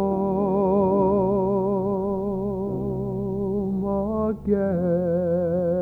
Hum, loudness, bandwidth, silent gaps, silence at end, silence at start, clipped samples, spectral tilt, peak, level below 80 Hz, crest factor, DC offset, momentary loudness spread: none; -23 LUFS; 2.6 kHz; none; 0 s; 0 s; under 0.1%; -12 dB/octave; -10 dBFS; -44 dBFS; 14 dB; under 0.1%; 7 LU